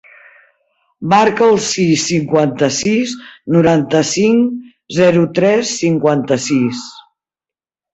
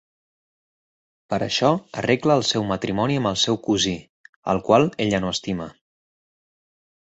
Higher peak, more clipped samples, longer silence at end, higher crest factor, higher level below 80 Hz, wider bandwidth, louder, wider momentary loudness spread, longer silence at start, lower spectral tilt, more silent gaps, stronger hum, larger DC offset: about the same, -2 dBFS vs -2 dBFS; neither; second, 0.95 s vs 1.35 s; second, 14 dB vs 22 dB; about the same, -52 dBFS vs -52 dBFS; about the same, 8.2 kHz vs 8.2 kHz; first, -14 LUFS vs -21 LUFS; about the same, 10 LU vs 11 LU; second, 1 s vs 1.3 s; about the same, -5 dB/octave vs -4.5 dB/octave; second, none vs 4.09-4.43 s; neither; neither